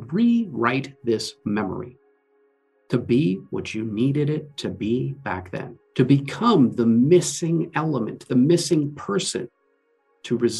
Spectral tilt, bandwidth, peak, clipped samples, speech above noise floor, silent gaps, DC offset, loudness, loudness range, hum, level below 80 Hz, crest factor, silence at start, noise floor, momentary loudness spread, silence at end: -6 dB/octave; 12.5 kHz; -4 dBFS; under 0.1%; 45 dB; none; under 0.1%; -22 LUFS; 6 LU; none; -64 dBFS; 18 dB; 0 s; -66 dBFS; 12 LU; 0 s